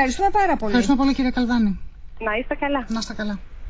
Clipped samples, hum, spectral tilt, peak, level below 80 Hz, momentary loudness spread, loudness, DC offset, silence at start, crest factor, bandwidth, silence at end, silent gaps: under 0.1%; none; -5 dB/octave; -6 dBFS; -36 dBFS; 10 LU; -22 LUFS; under 0.1%; 0 s; 14 dB; 8 kHz; 0 s; none